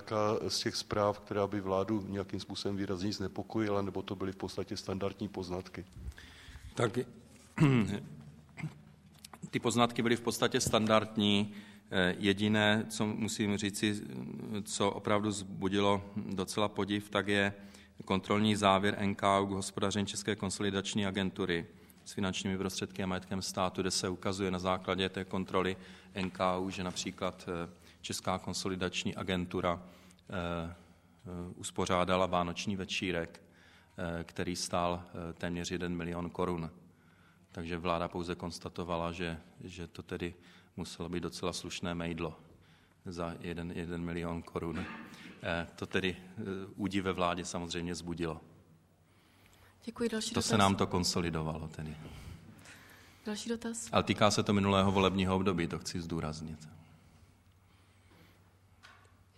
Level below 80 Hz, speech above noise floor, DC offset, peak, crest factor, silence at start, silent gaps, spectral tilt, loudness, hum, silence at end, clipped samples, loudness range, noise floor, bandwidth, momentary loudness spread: -60 dBFS; 32 dB; under 0.1%; -10 dBFS; 24 dB; 0 s; none; -4.5 dB/octave; -34 LUFS; none; 0.45 s; under 0.1%; 9 LU; -66 dBFS; 14.5 kHz; 16 LU